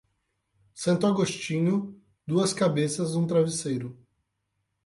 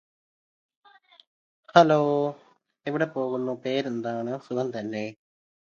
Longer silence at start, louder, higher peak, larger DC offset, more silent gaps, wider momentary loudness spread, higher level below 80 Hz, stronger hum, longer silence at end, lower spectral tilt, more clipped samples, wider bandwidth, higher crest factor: second, 0.75 s vs 1.75 s; about the same, -26 LUFS vs -26 LUFS; second, -12 dBFS vs -2 dBFS; neither; neither; second, 9 LU vs 13 LU; first, -68 dBFS vs -76 dBFS; neither; first, 0.9 s vs 0.55 s; about the same, -5.5 dB/octave vs -6.5 dB/octave; neither; first, 11.5 kHz vs 7.2 kHz; second, 16 dB vs 26 dB